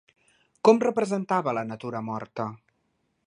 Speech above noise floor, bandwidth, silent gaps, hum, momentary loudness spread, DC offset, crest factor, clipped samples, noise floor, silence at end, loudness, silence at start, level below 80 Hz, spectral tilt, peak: 48 dB; 10.5 kHz; none; none; 14 LU; under 0.1%; 22 dB; under 0.1%; -73 dBFS; 0.7 s; -26 LUFS; 0.65 s; -74 dBFS; -6.5 dB/octave; -4 dBFS